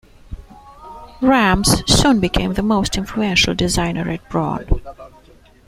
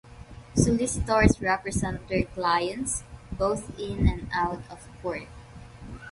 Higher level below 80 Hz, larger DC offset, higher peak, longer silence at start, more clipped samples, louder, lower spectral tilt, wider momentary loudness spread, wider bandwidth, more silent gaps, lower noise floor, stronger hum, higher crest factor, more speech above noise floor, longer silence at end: first, -30 dBFS vs -38 dBFS; neither; first, 0 dBFS vs -4 dBFS; first, 0.3 s vs 0.05 s; neither; first, -17 LUFS vs -27 LUFS; about the same, -4 dB/octave vs -5 dB/octave; second, 12 LU vs 22 LU; first, 16 kHz vs 11.5 kHz; neither; about the same, -47 dBFS vs -45 dBFS; neither; second, 18 dB vs 24 dB; first, 31 dB vs 19 dB; first, 0.6 s vs 0 s